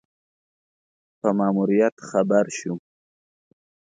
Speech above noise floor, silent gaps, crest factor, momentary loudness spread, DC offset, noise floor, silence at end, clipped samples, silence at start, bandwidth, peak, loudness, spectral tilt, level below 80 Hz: over 69 dB; 1.92-1.97 s; 20 dB; 11 LU; under 0.1%; under -90 dBFS; 1.15 s; under 0.1%; 1.25 s; 9.4 kHz; -6 dBFS; -22 LUFS; -6.5 dB/octave; -72 dBFS